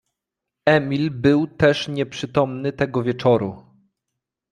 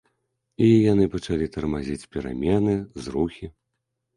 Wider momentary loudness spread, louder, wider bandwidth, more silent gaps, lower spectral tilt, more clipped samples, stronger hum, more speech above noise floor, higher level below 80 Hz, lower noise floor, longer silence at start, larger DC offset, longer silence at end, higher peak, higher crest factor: second, 6 LU vs 13 LU; first, -20 LUFS vs -23 LUFS; about the same, 10.5 kHz vs 11 kHz; neither; about the same, -7 dB/octave vs -8 dB/octave; neither; neither; first, 64 dB vs 57 dB; second, -54 dBFS vs -44 dBFS; first, -84 dBFS vs -79 dBFS; about the same, 0.65 s vs 0.6 s; neither; first, 0.9 s vs 0.65 s; first, -2 dBFS vs -8 dBFS; about the same, 20 dB vs 16 dB